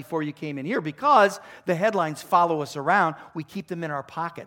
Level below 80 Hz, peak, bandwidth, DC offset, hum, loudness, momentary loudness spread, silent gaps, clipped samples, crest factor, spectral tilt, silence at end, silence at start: -72 dBFS; -6 dBFS; 17 kHz; under 0.1%; none; -24 LUFS; 15 LU; none; under 0.1%; 20 dB; -5.5 dB/octave; 0 s; 0 s